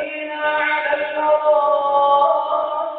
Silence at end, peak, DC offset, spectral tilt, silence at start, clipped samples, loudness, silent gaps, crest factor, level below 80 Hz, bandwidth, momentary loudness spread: 0 s; -6 dBFS; under 0.1%; 1 dB/octave; 0 s; under 0.1%; -17 LUFS; none; 12 dB; -66 dBFS; 4.5 kHz; 6 LU